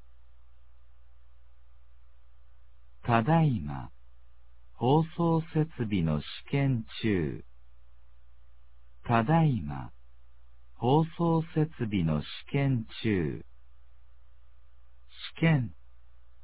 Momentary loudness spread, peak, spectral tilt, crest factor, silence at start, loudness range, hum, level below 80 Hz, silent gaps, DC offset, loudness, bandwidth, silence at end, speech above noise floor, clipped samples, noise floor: 15 LU; -8 dBFS; -11.5 dB/octave; 22 dB; 3.05 s; 4 LU; none; -52 dBFS; none; 0.6%; -29 LUFS; 4 kHz; 0.75 s; 32 dB; under 0.1%; -60 dBFS